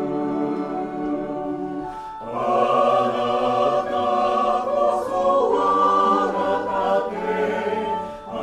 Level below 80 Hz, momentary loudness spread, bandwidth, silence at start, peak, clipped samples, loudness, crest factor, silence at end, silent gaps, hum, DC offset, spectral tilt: -52 dBFS; 10 LU; 11.5 kHz; 0 s; -6 dBFS; under 0.1%; -21 LUFS; 14 dB; 0 s; none; none; under 0.1%; -6 dB/octave